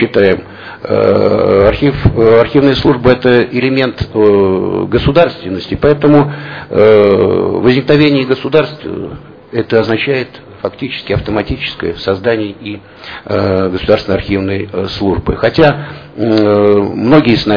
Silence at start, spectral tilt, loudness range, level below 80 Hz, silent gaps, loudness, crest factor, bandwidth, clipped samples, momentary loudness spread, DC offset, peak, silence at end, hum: 0 s; -8.5 dB/octave; 6 LU; -32 dBFS; none; -11 LUFS; 10 dB; 5.4 kHz; 0.8%; 13 LU; under 0.1%; 0 dBFS; 0 s; none